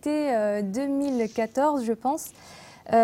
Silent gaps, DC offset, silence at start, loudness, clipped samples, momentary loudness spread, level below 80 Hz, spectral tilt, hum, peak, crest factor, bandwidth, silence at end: none; under 0.1%; 0.05 s; -26 LUFS; under 0.1%; 17 LU; -66 dBFS; -5.5 dB/octave; none; -10 dBFS; 16 dB; 16.5 kHz; 0 s